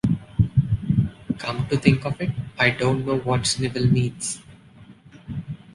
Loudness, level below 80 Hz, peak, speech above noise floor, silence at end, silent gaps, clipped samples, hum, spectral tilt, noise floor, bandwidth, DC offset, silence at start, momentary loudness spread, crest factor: -23 LUFS; -42 dBFS; -2 dBFS; 26 dB; 0.2 s; none; under 0.1%; none; -5.5 dB/octave; -48 dBFS; 11.5 kHz; under 0.1%; 0.05 s; 11 LU; 20 dB